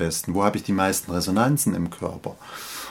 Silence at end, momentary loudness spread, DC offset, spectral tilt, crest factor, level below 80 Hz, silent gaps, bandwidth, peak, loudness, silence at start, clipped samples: 0 s; 14 LU; under 0.1%; -4.5 dB/octave; 20 dB; -50 dBFS; none; 19 kHz; -4 dBFS; -23 LUFS; 0 s; under 0.1%